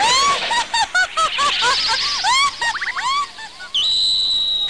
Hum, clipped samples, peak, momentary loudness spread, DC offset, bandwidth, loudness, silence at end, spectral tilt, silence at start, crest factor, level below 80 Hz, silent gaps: none; under 0.1%; -10 dBFS; 7 LU; 0.6%; 10.5 kHz; -16 LUFS; 0 s; 1.5 dB/octave; 0 s; 10 dB; -50 dBFS; none